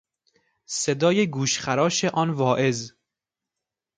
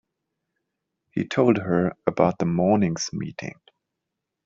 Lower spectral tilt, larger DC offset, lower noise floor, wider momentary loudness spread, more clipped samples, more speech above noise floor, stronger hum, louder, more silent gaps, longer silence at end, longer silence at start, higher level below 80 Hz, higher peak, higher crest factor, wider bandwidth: second, -4 dB/octave vs -6.5 dB/octave; neither; first, -87 dBFS vs -83 dBFS; second, 9 LU vs 12 LU; neither; first, 65 dB vs 61 dB; neither; about the same, -23 LUFS vs -23 LUFS; neither; first, 1.1 s vs 0.95 s; second, 0.7 s vs 1.15 s; about the same, -64 dBFS vs -60 dBFS; about the same, -6 dBFS vs -4 dBFS; about the same, 18 dB vs 22 dB; first, 9.6 kHz vs 7.6 kHz